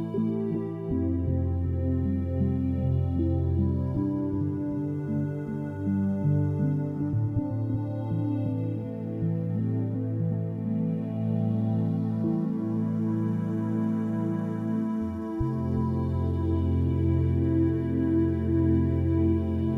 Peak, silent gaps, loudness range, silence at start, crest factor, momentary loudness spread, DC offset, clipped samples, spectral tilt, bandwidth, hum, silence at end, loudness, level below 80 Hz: -12 dBFS; none; 4 LU; 0 s; 14 dB; 5 LU; under 0.1%; under 0.1%; -11.5 dB/octave; 3.8 kHz; none; 0 s; -28 LUFS; -42 dBFS